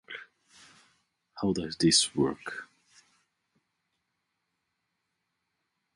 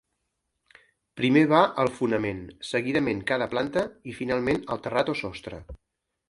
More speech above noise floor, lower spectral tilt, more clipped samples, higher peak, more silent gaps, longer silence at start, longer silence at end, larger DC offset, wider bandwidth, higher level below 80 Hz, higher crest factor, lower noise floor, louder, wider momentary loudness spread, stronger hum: about the same, 54 dB vs 53 dB; second, -3 dB/octave vs -6 dB/octave; neither; second, -10 dBFS vs -4 dBFS; neither; second, 0.1 s vs 1.15 s; first, 3.3 s vs 0.55 s; neither; about the same, 11.5 kHz vs 11.5 kHz; second, -62 dBFS vs -54 dBFS; about the same, 24 dB vs 22 dB; about the same, -82 dBFS vs -79 dBFS; about the same, -27 LUFS vs -26 LUFS; first, 21 LU vs 15 LU; neither